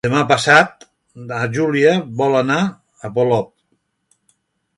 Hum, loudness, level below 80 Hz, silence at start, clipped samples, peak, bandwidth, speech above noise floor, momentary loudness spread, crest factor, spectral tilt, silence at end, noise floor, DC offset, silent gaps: none; -16 LUFS; -56 dBFS; 0.05 s; under 0.1%; 0 dBFS; 11.5 kHz; 51 dB; 16 LU; 18 dB; -5 dB/octave; 1.35 s; -67 dBFS; under 0.1%; none